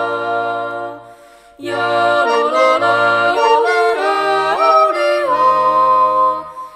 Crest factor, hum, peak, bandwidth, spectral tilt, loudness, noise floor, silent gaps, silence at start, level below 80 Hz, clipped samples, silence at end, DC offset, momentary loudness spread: 14 dB; none; 0 dBFS; 15.5 kHz; -4 dB/octave; -14 LUFS; -42 dBFS; none; 0 s; -56 dBFS; under 0.1%; 0 s; under 0.1%; 10 LU